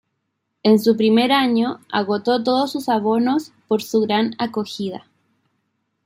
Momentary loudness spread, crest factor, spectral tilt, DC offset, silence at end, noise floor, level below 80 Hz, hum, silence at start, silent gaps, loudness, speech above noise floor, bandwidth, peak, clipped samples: 9 LU; 16 dB; -5.5 dB/octave; under 0.1%; 1.05 s; -74 dBFS; -68 dBFS; none; 0.65 s; none; -19 LUFS; 56 dB; 16 kHz; -4 dBFS; under 0.1%